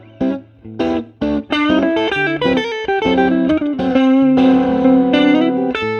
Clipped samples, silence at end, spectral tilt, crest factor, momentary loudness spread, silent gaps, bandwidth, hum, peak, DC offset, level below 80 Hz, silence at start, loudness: under 0.1%; 0 s; -6.5 dB/octave; 14 dB; 9 LU; none; 6.6 kHz; none; 0 dBFS; under 0.1%; -44 dBFS; 0.2 s; -15 LUFS